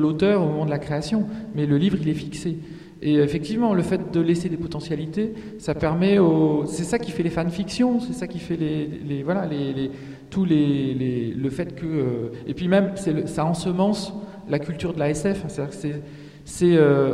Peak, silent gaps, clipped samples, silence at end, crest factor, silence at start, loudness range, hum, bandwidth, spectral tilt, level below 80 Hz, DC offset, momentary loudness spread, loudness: -4 dBFS; none; under 0.1%; 0 s; 18 dB; 0 s; 3 LU; none; 12.5 kHz; -7 dB/octave; -50 dBFS; under 0.1%; 11 LU; -23 LUFS